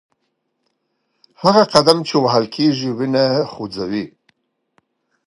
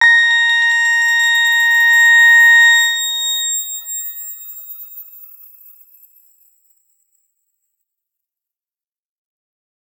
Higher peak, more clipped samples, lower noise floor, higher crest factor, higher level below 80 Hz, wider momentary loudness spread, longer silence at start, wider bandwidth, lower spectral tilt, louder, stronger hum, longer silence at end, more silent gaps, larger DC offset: about the same, 0 dBFS vs -2 dBFS; neither; second, -71 dBFS vs under -90 dBFS; about the same, 18 dB vs 14 dB; first, -60 dBFS vs under -90 dBFS; second, 13 LU vs 23 LU; first, 1.4 s vs 0 s; second, 16 kHz vs over 20 kHz; first, -5.5 dB/octave vs 8.5 dB/octave; second, -16 LUFS vs -10 LUFS; neither; second, 1.2 s vs 4.75 s; neither; neither